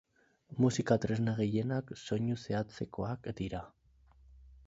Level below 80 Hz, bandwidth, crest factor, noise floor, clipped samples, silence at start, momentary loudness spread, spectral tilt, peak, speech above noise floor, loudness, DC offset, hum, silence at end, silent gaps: -58 dBFS; 8 kHz; 22 dB; -63 dBFS; under 0.1%; 0.5 s; 10 LU; -7 dB/octave; -12 dBFS; 30 dB; -35 LUFS; under 0.1%; none; 0.15 s; none